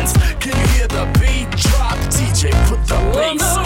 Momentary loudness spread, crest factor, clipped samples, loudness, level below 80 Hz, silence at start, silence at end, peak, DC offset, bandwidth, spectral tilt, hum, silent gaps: 2 LU; 14 dB; under 0.1%; -16 LUFS; -16 dBFS; 0 s; 0 s; 0 dBFS; under 0.1%; 16.5 kHz; -4.5 dB/octave; none; none